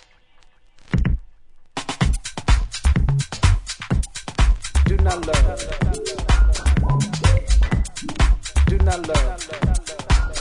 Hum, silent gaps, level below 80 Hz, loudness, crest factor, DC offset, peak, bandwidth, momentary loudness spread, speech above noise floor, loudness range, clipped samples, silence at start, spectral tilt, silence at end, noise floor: none; none; -20 dBFS; -21 LUFS; 16 dB; under 0.1%; -4 dBFS; 11 kHz; 7 LU; 30 dB; 3 LU; under 0.1%; 0.9 s; -5 dB/octave; 0 s; -50 dBFS